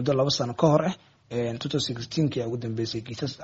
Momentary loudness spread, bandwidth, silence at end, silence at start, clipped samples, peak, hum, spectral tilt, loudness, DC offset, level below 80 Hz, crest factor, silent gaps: 10 LU; 8 kHz; 0 s; 0 s; under 0.1%; -6 dBFS; none; -5.5 dB/octave; -27 LUFS; under 0.1%; -60 dBFS; 20 dB; none